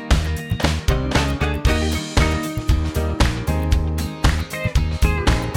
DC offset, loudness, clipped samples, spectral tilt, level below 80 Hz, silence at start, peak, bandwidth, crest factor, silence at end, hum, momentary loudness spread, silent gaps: 0.1%; -21 LUFS; under 0.1%; -5.5 dB/octave; -22 dBFS; 0 s; -2 dBFS; 17.5 kHz; 16 dB; 0 s; none; 3 LU; none